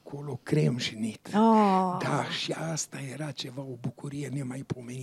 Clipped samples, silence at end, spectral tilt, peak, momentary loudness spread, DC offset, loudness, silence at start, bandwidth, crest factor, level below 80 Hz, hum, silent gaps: under 0.1%; 0 s; -5.5 dB/octave; -12 dBFS; 15 LU; under 0.1%; -29 LUFS; 0.05 s; 13.5 kHz; 18 dB; -72 dBFS; none; none